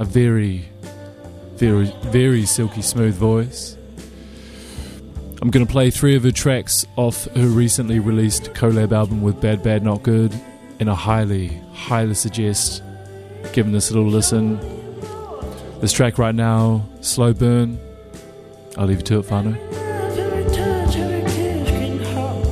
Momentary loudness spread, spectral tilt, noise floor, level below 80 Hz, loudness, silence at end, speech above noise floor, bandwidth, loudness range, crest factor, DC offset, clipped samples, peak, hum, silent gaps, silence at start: 20 LU; -5.5 dB/octave; -40 dBFS; -34 dBFS; -18 LUFS; 0 s; 22 dB; 14 kHz; 4 LU; 16 dB; under 0.1%; under 0.1%; -2 dBFS; none; none; 0 s